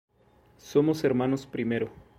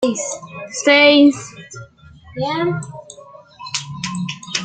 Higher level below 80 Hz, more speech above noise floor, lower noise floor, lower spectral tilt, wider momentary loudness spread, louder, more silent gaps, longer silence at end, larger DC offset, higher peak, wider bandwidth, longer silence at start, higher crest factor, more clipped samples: about the same, -62 dBFS vs -58 dBFS; first, 34 dB vs 28 dB; first, -61 dBFS vs -44 dBFS; first, -7 dB/octave vs -3.5 dB/octave; second, 6 LU vs 26 LU; second, -27 LUFS vs -16 LUFS; neither; first, 0.25 s vs 0 s; neither; second, -10 dBFS vs -2 dBFS; first, 15.5 kHz vs 9.4 kHz; first, 0.65 s vs 0 s; about the same, 18 dB vs 18 dB; neither